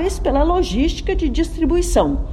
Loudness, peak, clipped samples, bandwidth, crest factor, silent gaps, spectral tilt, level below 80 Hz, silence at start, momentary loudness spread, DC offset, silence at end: -18 LUFS; -4 dBFS; under 0.1%; 13.5 kHz; 14 dB; none; -5.5 dB/octave; -22 dBFS; 0 s; 4 LU; under 0.1%; 0 s